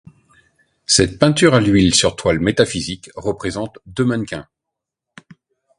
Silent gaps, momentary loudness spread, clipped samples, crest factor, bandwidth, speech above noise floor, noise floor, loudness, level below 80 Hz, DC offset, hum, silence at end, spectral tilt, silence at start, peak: none; 15 LU; under 0.1%; 18 dB; 11.5 kHz; 66 dB; -82 dBFS; -16 LUFS; -40 dBFS; under 0.1%; none; 1.35 s; -4 dB/octave; 0.9 s; 0 dBFS